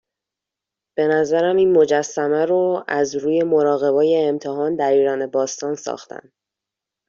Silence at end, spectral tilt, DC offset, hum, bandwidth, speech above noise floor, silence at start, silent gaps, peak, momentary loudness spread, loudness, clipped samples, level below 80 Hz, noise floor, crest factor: 0.9 s; -5 dB/octave; under 0.1%; none; 7.4 kHz; 68 dB; 0.95 s; none; -4 dBFS; 11 LU; -18 LUFS; under 0.1%; -66 dBFS; -86 dBFS; 16 dB